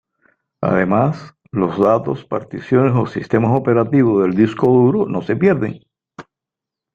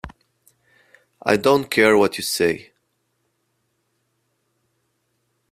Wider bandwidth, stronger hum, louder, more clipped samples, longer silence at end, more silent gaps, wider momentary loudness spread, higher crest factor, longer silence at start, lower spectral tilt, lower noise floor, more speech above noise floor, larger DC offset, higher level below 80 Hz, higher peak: second, 7.2 kHz vs 15.5 kHz; neither; about the same, -16 LUFS vs -18 LUFS; neither; second, 0.7 s vs 2.9 s; neither; second, 10 LU vs 13 LU; second, 16 dB vs 22 dB; first, 0.6 s vs 0.05 s; first, -9.5 dB/octave vs -4 dB/octave; first, -85 dBFS vs -71 dBFS; first, 70 dB vs 53 dB; neither; about the same, -54 dBFS vs -56 dBFS; about the same, 0 dBFS vs 0 dBFS